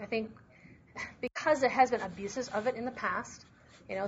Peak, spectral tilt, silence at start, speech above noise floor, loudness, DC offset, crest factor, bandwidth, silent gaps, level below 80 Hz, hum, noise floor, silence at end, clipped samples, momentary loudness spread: -12 dBFS; -3 dB/octave; 0 s; 25 dB; -32 LUFS; under 0.1%; 20 dB; 8 kHz; none; -66 dBFS; none; -57 dBFS; 0 s; under 0.1%; 17 LU